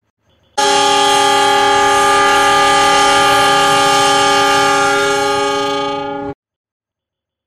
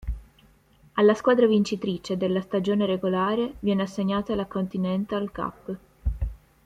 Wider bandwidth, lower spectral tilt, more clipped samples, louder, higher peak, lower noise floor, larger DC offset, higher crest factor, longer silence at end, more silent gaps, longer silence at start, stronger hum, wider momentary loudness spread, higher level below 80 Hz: first, 15 kHz vs 9 kHz; second, -1.5 dB/octave vs -7 dB/octave; neither; first, -11 LUFS vs -25 LUFS; first, -2 dBFS vs -8 dBFS; first, -83 dBFS vs -58 dBFS; neither; second, 12 dB vs 18 dB; first, 1.15 s vs 0.3 s; neither; first, 0.55 s vs 0 s; neither; second, 9 LU vs 14 LU; second, -46 dBFS vs -40 dBFS